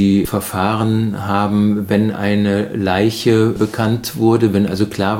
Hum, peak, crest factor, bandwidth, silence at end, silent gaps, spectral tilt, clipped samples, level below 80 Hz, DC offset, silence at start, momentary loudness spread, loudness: none; -2 dBFS; 14 dB; 17 kHz; 0 s; none; -6.5 dB/octave; under 0.1%; -46 dBFS; under 0.1%; 0 s; 4 LU; -16 LUFS